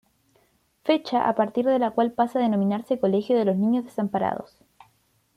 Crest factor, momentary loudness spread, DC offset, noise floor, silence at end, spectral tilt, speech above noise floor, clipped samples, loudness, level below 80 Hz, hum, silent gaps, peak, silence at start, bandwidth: 16 dB; 5 LU; under 0.1%; -66 dBFS; 0.9 s; -8 dB/octave; 43 dB; under 0.1%; -24 LUFS; -68 dBFS; none; none; -8 dBFS; 0.85 s; 13 kHz